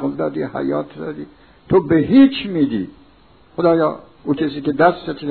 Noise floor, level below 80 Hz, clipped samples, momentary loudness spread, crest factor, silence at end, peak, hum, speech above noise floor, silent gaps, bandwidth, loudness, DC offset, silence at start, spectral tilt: -50 dBFS; -50 dBFS; under 0.1%; 17 LU; 18 dB; 0 s; 0 dBFS; none; 33 dB; none; 4.5 kHz; -17 LUFS; 0.2%; 0 s; -10.5 dB/octave